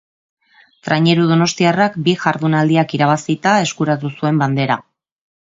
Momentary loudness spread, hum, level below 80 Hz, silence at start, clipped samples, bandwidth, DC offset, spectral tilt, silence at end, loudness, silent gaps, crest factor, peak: 6 LU; none; -60 dBFS; 0.85 s; under 0.1%; 7.8 kHz; under 0.1%; -5.5 dB/octave; 0.6 s; -16 LUFS; none; 16 dB; 0 dBFS